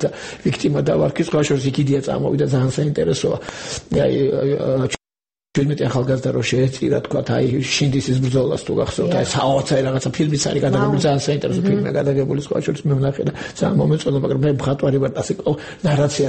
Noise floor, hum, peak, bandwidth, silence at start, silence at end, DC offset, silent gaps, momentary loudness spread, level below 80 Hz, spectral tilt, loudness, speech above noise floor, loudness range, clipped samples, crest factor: under -90 dBFS; none; -4 dBFS; 8.8 kHz; 0 s; 0 s; under 0.1%; none; 5 LU; -46 dBFS; -6 dB/octave; -19 LUFS; over 72 dB; 2 LU; under 0.1%; 14 dB